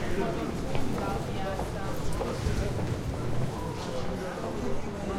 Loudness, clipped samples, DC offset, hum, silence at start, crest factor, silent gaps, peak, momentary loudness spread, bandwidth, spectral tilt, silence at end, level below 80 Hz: -33 LUFS; under 0.1%; under 0.1%; none; 0 s; 14 dB; none; -14 dBFS; 3 LU; 16 kHz; -6 dB/octave; 0 s; -40 dBFS